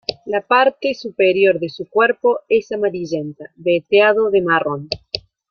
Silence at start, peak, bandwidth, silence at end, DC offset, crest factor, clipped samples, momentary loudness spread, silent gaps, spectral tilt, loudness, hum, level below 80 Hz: 0.1 s; -2 dBFS; 6.8 kHz; 0.3 s; under 0.1%; 16 dB; under 0.1%; 12 LU; none; -5.5 dB/octave; -17 LUFS; none; -58 dBFS